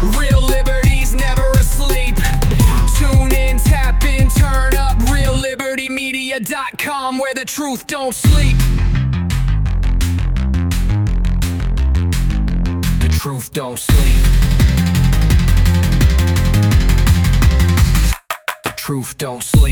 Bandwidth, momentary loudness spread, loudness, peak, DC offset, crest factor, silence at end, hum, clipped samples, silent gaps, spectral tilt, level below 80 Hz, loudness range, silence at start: 18 kHz; 8 LU; -16 LUFS; -2 dBFS; under 0.1%; 12 dB; 0 s; none; under 0.1%; none; -5.5 dB/octave; -14 dBFS; 4 LU; 0 s